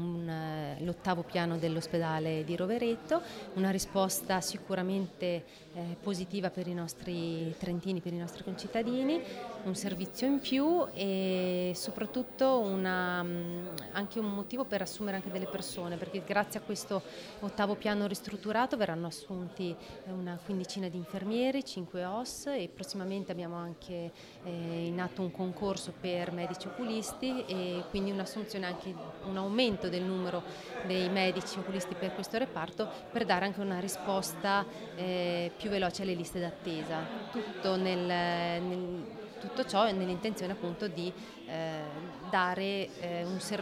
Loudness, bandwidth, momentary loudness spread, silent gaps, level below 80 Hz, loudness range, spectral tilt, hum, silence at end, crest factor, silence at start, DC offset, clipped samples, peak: -35 LUFS; over 20 kHz; 9 LU; none; -64 dBFS; 4 LU; -5 dB/octave; none; 0 s; 20 dB; 0 s; under 0.1%; under 0.1%; -14 dBFS